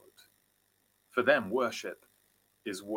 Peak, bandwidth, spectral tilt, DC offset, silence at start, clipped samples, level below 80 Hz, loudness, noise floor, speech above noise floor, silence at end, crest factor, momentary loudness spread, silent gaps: -10 dBFS; 17 kHz; -4 dB/octave; under 0.1%; 1.15 s; under 0.1%; -80 dBFS; -31 LUFS; -73 dBFS; 42 dB; 0 s; 24 dB; 17 LU; none